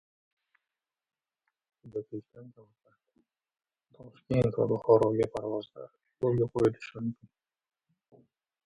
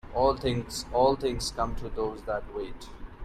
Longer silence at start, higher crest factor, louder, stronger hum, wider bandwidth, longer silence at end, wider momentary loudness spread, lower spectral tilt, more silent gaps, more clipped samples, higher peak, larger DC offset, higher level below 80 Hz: first, 1.85 s vs 0.05 s; first, 24 dB vs 18 dB; about the same, -30 LUFS vs -29 LUFS; neither; second, 11 kHz vs 14 kHz; first, 1.55 s vs 0 s; first, 21 LU vs 14 LU; first, -8.5 dB/octave vs -5 dB/octave; neither; neither; about the same, -10 dBFS vs -12 dBFS; neither; second, -62 dBFS vs -42 dBFS